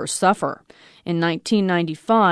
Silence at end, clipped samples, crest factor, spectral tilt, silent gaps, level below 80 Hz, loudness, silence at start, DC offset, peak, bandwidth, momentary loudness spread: 0 s; under 0.1%; 16 dB; -5 dB/octave; none; -66 dBFS; -21 LUFS; 0 s; under 0.1%; -4 dBFS; 11 kHz; 11 LU